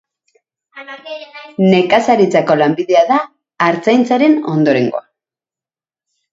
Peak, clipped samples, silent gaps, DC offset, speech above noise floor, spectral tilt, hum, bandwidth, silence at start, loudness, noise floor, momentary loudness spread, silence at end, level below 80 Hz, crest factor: 0 dBFS; under 0.1%; none; under 0.1%; over 77 dB; -6.5 dB/octave; none; 7.8 kHz; 0.75 s; -13 LUFS; under -90 dBFS; 18 LU; 1.35 s; -60 dBFS; 14 dB